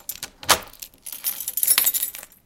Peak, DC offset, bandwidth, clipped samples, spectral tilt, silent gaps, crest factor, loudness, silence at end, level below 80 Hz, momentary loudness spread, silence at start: 0 dBFS; under 0.1%; 17.5 kHz; under 0.1%; 1 dB/octave; none; 24 dB; -20 LUFS; 0.2 s; -54 dBFS; 18 LU; 0.1 s